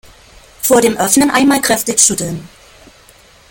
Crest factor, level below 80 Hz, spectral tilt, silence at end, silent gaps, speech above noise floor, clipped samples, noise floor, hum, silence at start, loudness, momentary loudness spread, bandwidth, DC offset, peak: 14 dB; -46 dBFS; -2.5 dB/octave; 1.05 s; none; 32 dB; under 0.1%; -44 dBFS; none; 0.6 s; -12 LUFS; 10 LU; 17 kHz; under 0.1%; 0 dBFS